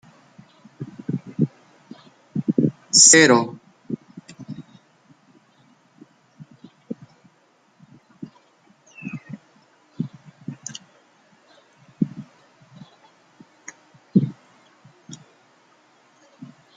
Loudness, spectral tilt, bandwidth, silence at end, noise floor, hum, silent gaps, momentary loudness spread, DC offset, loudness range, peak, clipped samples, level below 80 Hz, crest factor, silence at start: -18 LUFS; -2.5 dB/octave; 11 kHz; 0.3 s; -60 dBFS; none; none; 30 LU; under 0.1%; 24 LU; 0 dBFS; under 0.1%; -70 dBFS; 26 dB; 0.8 s